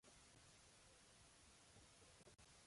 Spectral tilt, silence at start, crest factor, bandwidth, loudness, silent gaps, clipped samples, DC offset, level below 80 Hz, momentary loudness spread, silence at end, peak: -2.5 dB/octave; 0 s; 14 dB; 11.5 kHz; -68 LUFS; none; under 0.1%; under 0.1%; -80 dBFS; 1 LU; 0 s; -54 dBFS